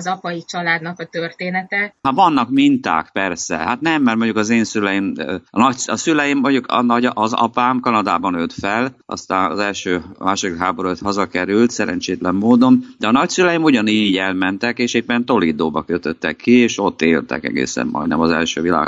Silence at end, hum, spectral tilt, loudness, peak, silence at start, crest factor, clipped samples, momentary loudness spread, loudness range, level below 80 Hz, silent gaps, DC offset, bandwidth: 0 s; none; -4.5 dB/octave; -17 LUFS; 0 dBFS; 0 s; 16 dB; under 0.1%; 8 LU; 4 LU; -52 dBFS; none; under 0.1%; 8 kHz